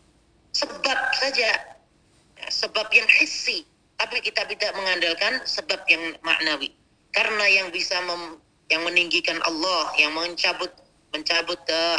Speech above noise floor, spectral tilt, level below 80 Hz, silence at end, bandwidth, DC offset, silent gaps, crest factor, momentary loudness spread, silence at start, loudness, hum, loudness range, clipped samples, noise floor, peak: 36 dB; -0.5 dB/octave; -66 dBFS; 0 s; 10.5 kHz; under 0.1%; none; 22 dB; 11 LU; 0.55 s; -22 LUFS; none; 2 LU; under 0.1%; -60 dBFS; -2 dBFS